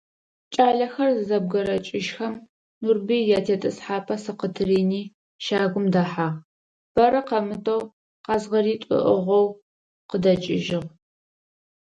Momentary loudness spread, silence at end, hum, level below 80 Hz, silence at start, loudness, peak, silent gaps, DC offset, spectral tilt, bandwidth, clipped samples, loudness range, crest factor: 11 LU; 1.1 s; none; -60 dBFS; 0.5 s; -23 LUFS; -6 dBFS; 2.49-2.81 s, 5.14-5.39 s, 6.45-6.95 s, 7.93-8.24 s, 9.62-10.09 s; under 0.1%; -6.5 dB/octave; 9 kHz; under 0.1%; 2 LU; 18 dB